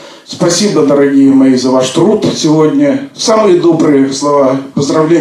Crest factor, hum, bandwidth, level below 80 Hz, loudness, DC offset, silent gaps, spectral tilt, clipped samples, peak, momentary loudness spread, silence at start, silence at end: 8 dB; none; 12 kHz; -56 dBFS; -9 LUFS; under 0.1%; none; -5 dB/octave; 0.2%; 0 dBFS; 6 LU; 0 s; 0 s